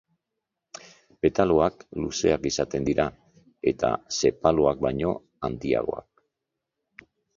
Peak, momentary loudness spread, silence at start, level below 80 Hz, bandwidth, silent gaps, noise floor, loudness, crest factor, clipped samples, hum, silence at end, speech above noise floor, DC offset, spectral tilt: -4 dBFS; 12 LU; 1.25 s; -48 dBFS; 7.6 kHz; none; -84 dBFS; -25 LUFS; 24 dB; under 0.1%; none; 1.4 s; 60 dB; under 0.1%; -5 dB/octave